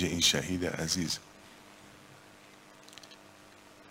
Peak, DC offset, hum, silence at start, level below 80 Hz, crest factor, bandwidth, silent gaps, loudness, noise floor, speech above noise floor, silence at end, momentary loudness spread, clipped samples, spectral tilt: -12 dBFS; under 0.1%; none; 0 s; -62 dBFS; 24 dB; 16 kHz; none; -30 LUFS; -56 dBFS; 24 dB; 0 s; 28 LU; under 0.1%; -2.5 dB/octave